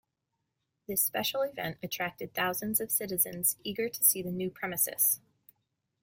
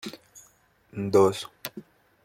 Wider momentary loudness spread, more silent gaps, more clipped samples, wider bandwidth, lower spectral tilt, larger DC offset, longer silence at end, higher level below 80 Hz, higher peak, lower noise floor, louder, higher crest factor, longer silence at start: second, 10 LU vs 24 LU; neither; neither; about the same, 16.5 kHz vs 16.5 kHz; second, -2 dB/octave vs -5.5 dB/octave; neither; first, 0.85 s vs 0.45 s; about the same, -70 dBFS vs -68 dBFS; about the same, -10 dBFS vs -8 dBFS; first, -83 dBFS vs -61 dBFS; second, -29 LUFS vs -25 LUFS; about the same, 24 dB vs 20 dB; first, 0.9 s vs 0.05 s